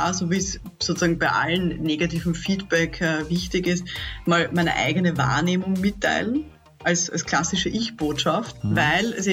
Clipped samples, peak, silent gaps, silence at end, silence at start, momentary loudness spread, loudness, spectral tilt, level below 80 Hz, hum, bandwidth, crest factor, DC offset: under 0.1%; -8 dBFS; none; 0 s; 0 s; 6 LU; -23 LUFS; -4 dB/octave; -44 dBFS; none; 16 kHz; 14 dB; under 0.1%